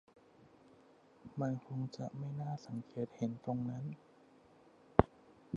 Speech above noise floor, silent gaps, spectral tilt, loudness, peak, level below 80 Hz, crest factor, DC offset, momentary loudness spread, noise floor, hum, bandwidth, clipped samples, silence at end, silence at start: 24 dB; none; -8.5 dB/octave; -40 LUFS; -4 dBFS; -58 dBFS; 36 dB; under 0.1%; 15 LU; -65 dBFS; none; 7.6 kHz; under 0.1%; 0 s; 1.25 s